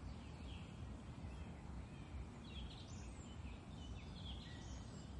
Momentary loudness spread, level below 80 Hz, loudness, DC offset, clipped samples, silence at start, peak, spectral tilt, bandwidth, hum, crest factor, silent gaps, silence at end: 2 LU; -56 dBFS; -53 LUFS; under 0.1%; under 0.1%; 0 s; -40 dBFS; -5.5 dB/octave; 11 kHz; none; 12 dB; none; 0 s